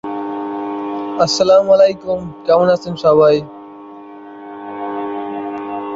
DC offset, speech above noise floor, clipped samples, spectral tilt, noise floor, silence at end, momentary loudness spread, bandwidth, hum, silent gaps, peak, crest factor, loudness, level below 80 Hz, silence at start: under 0.1%; 23 dB; under 0.1%; -5 dB/octave; -35 dBFS; 0 s; 24 LU; 7.8 kHz; none; none; -2 dBFS; 14 dB; -15 LUFS; -54 dBFS; 0.05 s